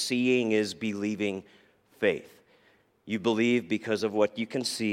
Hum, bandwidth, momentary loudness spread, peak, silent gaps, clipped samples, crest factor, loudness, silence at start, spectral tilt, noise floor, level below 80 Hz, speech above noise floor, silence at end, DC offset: none; 16 kHz; 7 LU; -12 dBFS; none; under 0.1%; 18 dB; -28 LUFS; 0 s; -4.5 dB/octave; -64 dBFS; -74 dBFS; 37 dB; 0 s; under 0.1%